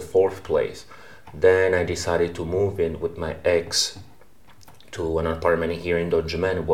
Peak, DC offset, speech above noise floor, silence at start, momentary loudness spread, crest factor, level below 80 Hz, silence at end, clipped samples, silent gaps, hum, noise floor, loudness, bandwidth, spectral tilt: -4 dBFS; 0.5%; 31 dB; 0 s; 10 LU; 20 dB; -44 dBFS; 0 s; under 0.1%; none; none; -54 dBFS; -23 LUFS; 16 kHz; -4.5 dB/octave